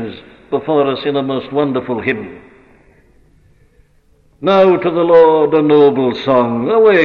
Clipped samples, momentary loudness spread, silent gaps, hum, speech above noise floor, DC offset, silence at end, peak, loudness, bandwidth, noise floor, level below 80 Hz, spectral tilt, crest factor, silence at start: under 0.1%; 12 LU; none; none; 40 dB; under 0.1%; 0 s; -2 dBFS; -13 LUFS; 5.6 kHz; -52 dBFS; -52 dBFS; -8 dB/octave; 12 dB; 0 s